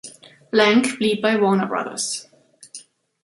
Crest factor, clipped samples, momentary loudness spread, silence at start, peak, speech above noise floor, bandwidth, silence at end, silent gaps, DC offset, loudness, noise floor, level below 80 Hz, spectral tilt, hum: 20 dB; under 0.1%; 23 LU; 0.05 s; -2 dBFS; 26 dB; 11.5 kHz; 0.45 s; none; under 0.1%; -19 LUFS; -44 dBFS; -68 dBFS; -4 dB/octave; none